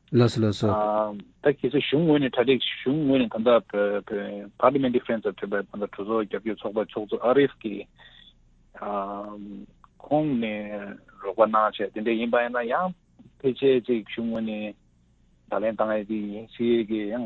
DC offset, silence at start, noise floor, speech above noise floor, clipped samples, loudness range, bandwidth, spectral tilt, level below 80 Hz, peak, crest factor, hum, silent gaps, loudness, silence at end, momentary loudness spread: under 0.1%; 0.1 s; -61 dBFS; 36 dB; under 0.1%; 6 LU; 8 kHz; -7.5 dB/octave; -58 dBFS; -4 dBFS; 20 dB; none; none; -25 LUFS; 0 s; 13 LU